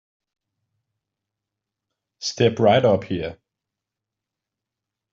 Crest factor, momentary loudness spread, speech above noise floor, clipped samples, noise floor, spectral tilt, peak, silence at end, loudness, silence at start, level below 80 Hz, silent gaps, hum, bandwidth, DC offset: 22 dB; 13 LU; 67 dB; under 0.1%; -86 dBFS; -5 dB/octave; -4 dBFS; 1.8 s; -20 LUFS; 2.2 s; -60 dBFS; none; none; 7.4 kHz; under 0.1%